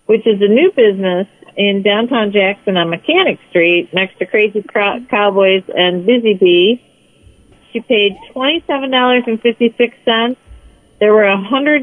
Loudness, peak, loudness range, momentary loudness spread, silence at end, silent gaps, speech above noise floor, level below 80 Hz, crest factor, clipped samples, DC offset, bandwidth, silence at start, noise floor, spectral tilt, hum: -13 LUFS; 0 dBFS; 2 LU; 6 LU; 0 s; none; 34 dB; -54 dBFS; 12 dB; under 0.1%; under 0.1%; 9.8 kHz; 0.1 s; -47 dBFS; -7 dB/octave; none